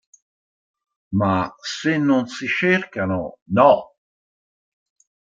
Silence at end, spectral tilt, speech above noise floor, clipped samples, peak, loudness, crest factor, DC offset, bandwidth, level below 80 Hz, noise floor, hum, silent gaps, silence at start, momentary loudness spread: 1.55 s; -6 dB/octave; over 71 dB; under 0.1%; -2 dBFS; -20 LUFS; 20 dB; under 0.1%; 7.8 kHz; -58 dBFS; under -90 dBFS; none; 3.42-3.46 s; 1.1 s; 10 LU